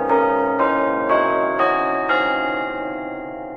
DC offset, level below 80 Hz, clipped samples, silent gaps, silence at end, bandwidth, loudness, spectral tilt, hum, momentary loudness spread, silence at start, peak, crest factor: under 0.1%; -52 dBFS; under 0.1%; none; 0 s; 6.2 kHz; -19 LUFS; -6.5 dB/octave; none; 10 LU; 0 s; -6 dBFS; 14 dB